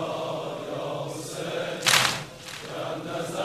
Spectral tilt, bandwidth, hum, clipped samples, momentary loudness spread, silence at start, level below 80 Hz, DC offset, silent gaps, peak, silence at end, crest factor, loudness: -2 dB/octave; 14 kHz; none; under 0.1%; 14 LU; 0 s; -64 dBFS; under 0.1%; none; -2 dBFS; 0 s; 26 dB; -27 LUFS